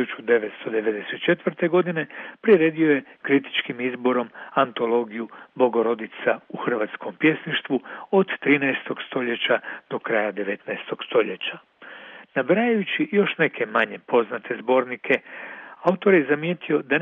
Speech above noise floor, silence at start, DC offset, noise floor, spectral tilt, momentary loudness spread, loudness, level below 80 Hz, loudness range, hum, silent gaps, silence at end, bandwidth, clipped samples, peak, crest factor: 20 dB; 0 s; under 0.1%; -43 dBFS; -8 dB/octave; 11 LU; -23 LUFS; -76 dBFS; 3 LU; none; none; 0 s; 4 kHz; under 0.1%; -4 dBFS; 18 dB